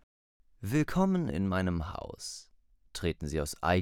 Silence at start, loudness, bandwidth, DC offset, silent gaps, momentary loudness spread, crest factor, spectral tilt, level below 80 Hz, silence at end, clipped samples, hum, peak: 0.6 s; -32 LUFS; 17 kHz; under 0.1%; none; 14 LU; 18 dB; -6 dB/octave; -48 dBFS; 0 s; under 0.1%; none; -14 dBFS